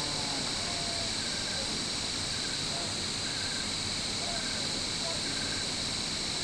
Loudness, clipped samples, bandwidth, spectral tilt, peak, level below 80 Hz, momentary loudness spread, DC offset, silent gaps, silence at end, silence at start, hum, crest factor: -31 LUFS; under 0.1%; 11 kHz; -1.5 dB/octave; -20 dBFS; -52 dBFS; 1 LU; under 0.1%; none; 0 s; 0 s; none; 14 dB